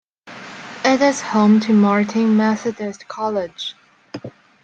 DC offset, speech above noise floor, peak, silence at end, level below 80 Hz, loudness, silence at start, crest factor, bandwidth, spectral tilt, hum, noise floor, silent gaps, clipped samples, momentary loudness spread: under 0.1%; 21 dB; -2 dBFS; 0.35 s; -64 dBFS; -17 LUFS; 0.25 s; 16 dB; 8.6 kHz; -5.5 dB/octave; none; -38 dBFS; none; under 0.1%; 20 LU